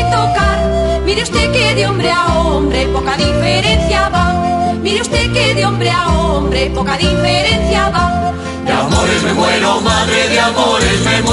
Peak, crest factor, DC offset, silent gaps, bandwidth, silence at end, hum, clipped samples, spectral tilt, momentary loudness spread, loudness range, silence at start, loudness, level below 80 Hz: -2 dBFS; 12 dB; under 0.1%; none; 11.5 kHz; 0 s; none; under 0.1%; -4.5 dB/octave; 4 LU; 1 LU; 0 s; -12 LUFS; -22 dBFS